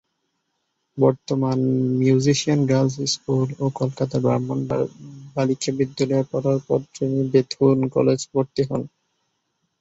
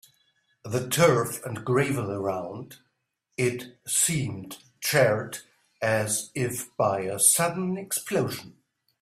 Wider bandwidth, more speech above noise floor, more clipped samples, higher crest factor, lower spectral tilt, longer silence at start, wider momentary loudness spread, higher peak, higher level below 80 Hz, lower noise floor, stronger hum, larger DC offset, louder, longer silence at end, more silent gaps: second, 8 kHz vs 16 kHz; about the same, 54 dB vs 51 dB; neither; about the same, 18 dB vs 22 dB; first, -6.5 dB/octave vs -3.5 dB/octave; first, 0.95 s vs 0.65 s; second, 7 LU vs 17 LU; about the same, -4 dBFS vs -6 dBFS; first, -58 dBFS vs -64 dBFS; about the same, -74 dBFS vs -77 dBFS; neither; neither; first, -21 LUFS vs -25 LUFS; first, 0.95 s vs 0.5 s; neither